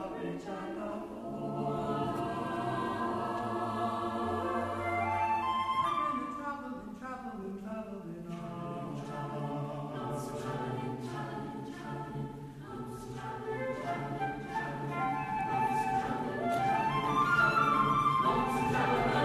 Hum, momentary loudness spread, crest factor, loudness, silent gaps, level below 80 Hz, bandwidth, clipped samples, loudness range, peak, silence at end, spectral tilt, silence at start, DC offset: none; 14 LU; 18 dB; -34 LUFS; none; -58 dBFS; 14 kHz; under 0.1%; 11 LU; -16 dBFS; 0 s; -6 dB/octave; 0 s; under 0.1%